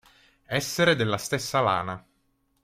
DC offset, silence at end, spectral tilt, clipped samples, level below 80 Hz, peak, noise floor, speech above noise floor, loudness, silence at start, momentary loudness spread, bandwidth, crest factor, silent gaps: under 0.1%; 0.65 s; -4 dB/octave; under 0.1%; -60 dBFS; -8 dBFS; -70 dBFS; 45 dB; -25 LUFS; 0.5 s; 10 LU; 16.5 kHz; 20 dB; none